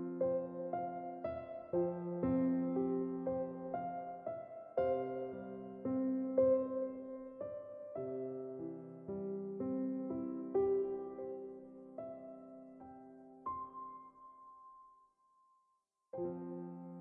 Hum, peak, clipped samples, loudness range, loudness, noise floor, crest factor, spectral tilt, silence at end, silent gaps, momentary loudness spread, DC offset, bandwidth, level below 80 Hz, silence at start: none; -20 dBFS; under 0.1%; 13 LU; -40 LUFS; -81 dBFS; 20 dB; -9.5 dB/octave; 0 s; none; 19 LU; under 0.1%; 3.6 kHz; -74 dBFS; 0 s